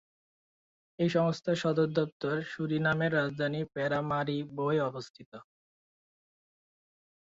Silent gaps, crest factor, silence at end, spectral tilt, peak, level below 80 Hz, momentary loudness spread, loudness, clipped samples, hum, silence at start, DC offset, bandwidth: 2.12-2.20 s, 5.10-5.14 s, 5.26-5.32 s; 18 dB; 1.85 s; -7 dB/octave; -14 dBFS; -70 dBFS; 7 LU; -31 LUFS; under 0.1%; none; 1 s; under 0.1%; 7.8 kHz